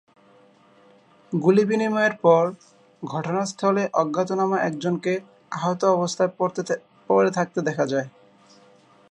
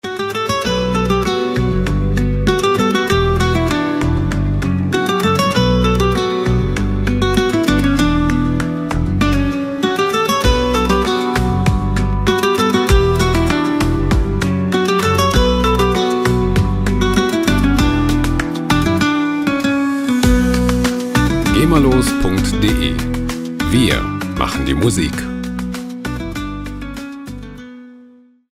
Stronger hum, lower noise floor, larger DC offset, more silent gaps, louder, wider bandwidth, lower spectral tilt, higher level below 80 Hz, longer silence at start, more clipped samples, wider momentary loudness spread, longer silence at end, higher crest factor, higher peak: neither; first, -55 dBFS vs -45 dBFS; neither; neither; second, -23 LUFS vs -16 LUFS; second, 10.5 kHz vs 16 kHz; about the same, -6 dB/octave vs -5.5 dB/octave; second, -74 dBFS vs -24 dBFS; first, 1.3 s vs 0.05 s; neither; first, 11 LU vs 8 LU; first, 1 s vs 0.5 s; first, 20 dB vs 14 dB; second, -4 dBFS vs 0 dBFS